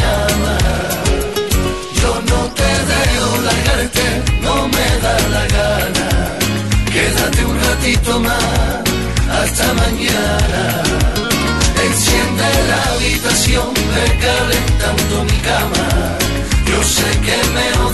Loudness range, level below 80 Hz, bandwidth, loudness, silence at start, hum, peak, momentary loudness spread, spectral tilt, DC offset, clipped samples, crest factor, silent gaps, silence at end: 1 LU; -20 dBFS; 12.5 kHz; -14 LUFS; 0 s; none; 0 dBFS; 3 LU; -4 dB/octave; 1%; under 0.1%; 14 dB; none; 0 s